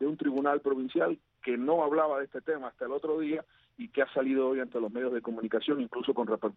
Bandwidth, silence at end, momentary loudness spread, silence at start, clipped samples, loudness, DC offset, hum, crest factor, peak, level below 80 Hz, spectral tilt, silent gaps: 4.4 kHz; 0.05 s; 7 LU; 0 s; under 0.1%; -31 LUFS; under 0.1%; none; 18 dB; -12 dBFS; -76 dBFS; -3.5 dB/octave; none